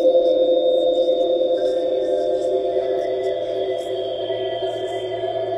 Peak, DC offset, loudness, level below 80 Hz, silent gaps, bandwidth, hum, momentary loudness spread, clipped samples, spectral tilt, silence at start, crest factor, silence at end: -6 dBFS; under 0.1%; -21 LUFS; -58 dBFS; none; 8.8 kHz; none; 8 LU; under 0.1%; -5.5 dB/octave; 0 s; 14 dB; 0 s